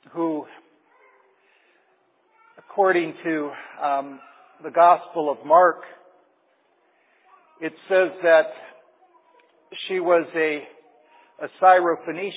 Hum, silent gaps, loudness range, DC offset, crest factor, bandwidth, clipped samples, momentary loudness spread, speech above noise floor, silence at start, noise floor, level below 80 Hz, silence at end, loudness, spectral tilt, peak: none; none; 6 LU; under 0.1%; 20 dB; 4 kHz; under 0.1%; 18 LU; 44 dB; 0.15 s; -64 dBFS; under -90 dBFS; 0 s; -21 LUFS; -8.5 dB/octave; -2 dBFS